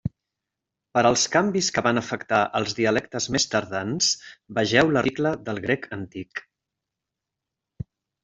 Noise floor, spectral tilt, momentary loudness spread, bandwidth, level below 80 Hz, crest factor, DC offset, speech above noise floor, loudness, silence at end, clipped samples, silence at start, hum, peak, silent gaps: -86 dBFS; -3.5 dB/octave; 16 LU; 8.2 kHz; -56 dBFS; 22 dB; under 0.1%; 62 dB; -23 LUFS; 1.85 s; under 0.1%; 0.05 s; none; -4 dBFS; none